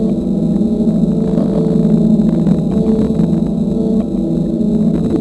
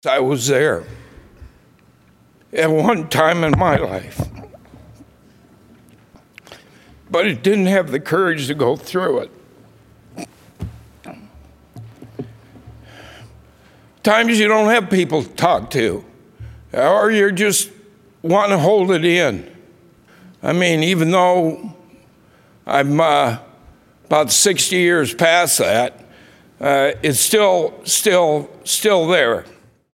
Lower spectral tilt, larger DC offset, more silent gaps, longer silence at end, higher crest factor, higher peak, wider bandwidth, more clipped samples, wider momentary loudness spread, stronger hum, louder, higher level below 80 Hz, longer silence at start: first, -10 dB/octave vs -3.5 dB/octave; neither; neither; second, 0 s vs 0.5 s; second, 12 dB vs 18 dB; about the same, 0 dBFS vs 0 dBFS; second, 11 kHz vs 16.5 kHz; neither; second, 4 LU vs 17 LU; neither; about the same, -14 LUFS vs -16 LUFS; first, -32 dBFS vs -48 dBFS; about the same, 0 s vs 0.05 s